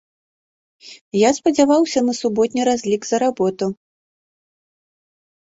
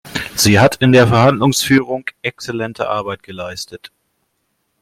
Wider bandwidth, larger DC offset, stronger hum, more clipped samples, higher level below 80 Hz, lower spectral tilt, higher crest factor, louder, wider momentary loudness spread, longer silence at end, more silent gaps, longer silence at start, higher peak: second, 8 kHz vs 16.5 kHz; neither; neither; neither; second, -60 dBFS vs -48 dBFS; about the same, -4.5 dB/octave vs -5 dB/octave; about the same, 18 dB vs 14 dB; second, -18 LUFS vs -14 LUFS; second, 10 LU vs 16 LU; first, 1.7 s vs 1.05 s; first, 1.01-1.11 s vs none; first, 0.85 s vs 0.05 s; about the same, -2 dBFS vs 0 dBFS